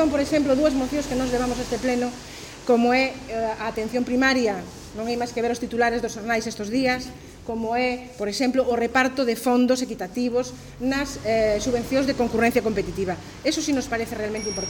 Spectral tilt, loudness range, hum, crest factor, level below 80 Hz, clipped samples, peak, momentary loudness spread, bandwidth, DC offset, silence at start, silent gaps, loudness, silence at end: -4 dB/octave; 2 LU; none; 16 dB; -46 dBFS; under 0.1%; -6 dBFS; 9 LU; 17.5 kHz; under 0.1%; 0 s; none; -24 LUFS; 0 s